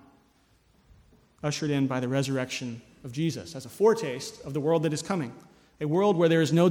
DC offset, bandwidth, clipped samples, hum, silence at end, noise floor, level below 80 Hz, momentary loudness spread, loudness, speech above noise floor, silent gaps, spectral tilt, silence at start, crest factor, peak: under 0.1%; 16.5 kHz; under 0.1%; none; 0 s; -64 dBFS; -64 dBFS; 15 LU; -27 LUFS; 38 dB; none; -6 dB/octave; 1.45 s; 18 dB; -10 dBFS